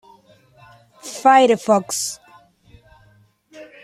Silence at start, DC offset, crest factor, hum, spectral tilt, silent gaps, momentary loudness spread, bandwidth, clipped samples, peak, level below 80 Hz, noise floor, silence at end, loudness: 1.05 s; under 0.1%; 20 dB; none; -3 dB/octave; none; 23 LU; 15 kHz; under 0.1%; -2 dBFS; -64 dBFS; -55 dBFS; 0.2 s; -16 LUFS